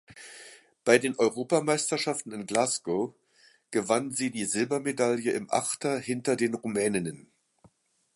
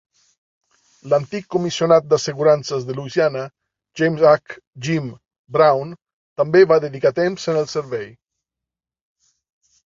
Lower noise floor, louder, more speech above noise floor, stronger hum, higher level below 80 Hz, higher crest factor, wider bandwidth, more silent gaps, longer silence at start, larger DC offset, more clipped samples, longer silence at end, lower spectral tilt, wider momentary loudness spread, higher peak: second, -65 dBFS vs -87 dBFS; second, -28 LUFS vs -18 LUFS; second, 37 dB vs 69 dB; neither; second, -72 dBFS vs -62 dBFS; first, 24 dB vs 18 dB; first, 12 kHz vs 7.8 kHz; second, none vs 4.67-4.71 s, 5.39-5.44 s, 6.13-6.36 s; second, 0.1 s vs 1.05 s; neither; neither; second, 0.95 s vs 1.8 s; second, -3.5 dB/octave vs -5.5 dB/octave; second, 9 LU vs 16 LU; about the same, -4 dBFS vs -2 dBFS